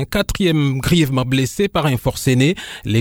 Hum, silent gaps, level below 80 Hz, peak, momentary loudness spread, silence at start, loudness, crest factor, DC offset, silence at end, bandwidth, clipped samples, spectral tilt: none; none; -34 dBFS; -2 dBFS; 4 LU; 0 s; -17 LUFS; 14 dB; under 0.1%; 0 s; 17.5 kHz; under 0.1%; -5.5 dB/octave